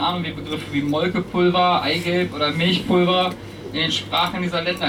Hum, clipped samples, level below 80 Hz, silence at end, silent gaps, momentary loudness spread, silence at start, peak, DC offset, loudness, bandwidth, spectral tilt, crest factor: none; under 0.1%; -50 dBFS; 0 s; none; 9 LU; 0 s; -8 dBFS; under 0.1%; -20 LUFS; 16 kHz; -5.5 dB/octave; 12 dB